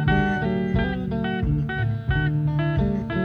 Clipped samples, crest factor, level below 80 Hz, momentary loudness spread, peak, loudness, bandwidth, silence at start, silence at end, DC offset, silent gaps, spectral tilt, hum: under 0.1%; 14 dB; -32 dBFS; 4 LU; -8 dBFS; -24 LUFS; 5.2 kHz; 0 s; 0 s; under 0.1%; none; -9 dB/octave; none